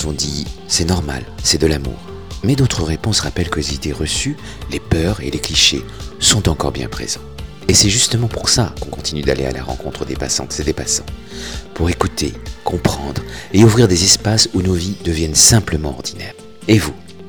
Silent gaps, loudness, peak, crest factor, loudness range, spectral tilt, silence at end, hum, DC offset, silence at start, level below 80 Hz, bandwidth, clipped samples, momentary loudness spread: none; -16 LUFS; 0 dBFS; 16 dB; 7 LU; -3.5 dB/octave; 0 s; none; 1%; 0 s; -30 dBFS; over 20 kHz; under 0.1%; 15 LU